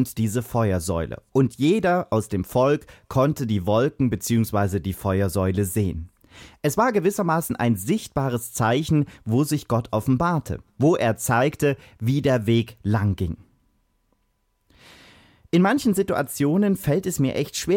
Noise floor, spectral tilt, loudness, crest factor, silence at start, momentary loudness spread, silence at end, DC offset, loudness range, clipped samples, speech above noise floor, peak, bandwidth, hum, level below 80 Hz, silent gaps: -69 dBFS; -6 dB/octave; -23 LUFS; 16 dB; 0 s; 6 LU; 0 s; under 0.1%; 4 LU; under 0.1%; 47 dB; -8 dBFS; 17 kHz; none; -46 dBFS; none